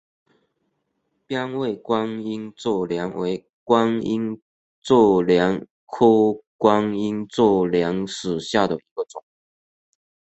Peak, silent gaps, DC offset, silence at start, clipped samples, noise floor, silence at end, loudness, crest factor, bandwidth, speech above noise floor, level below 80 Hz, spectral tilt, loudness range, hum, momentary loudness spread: 0 dBFS; 3.53-3.66 s, 4.42-4.82 s, 5.70-5.87 s, 6.47-6.59 s, 8.91-8.96 s; under 0.1%; 1.3 s; under 0.1%; -73 dBFS; 1.15 s; -21 LUFS; 22 dB; 8.2 kHz; 53 dB; -58 dBFS; -6 dB/octave; 7 LU; none; 14 LU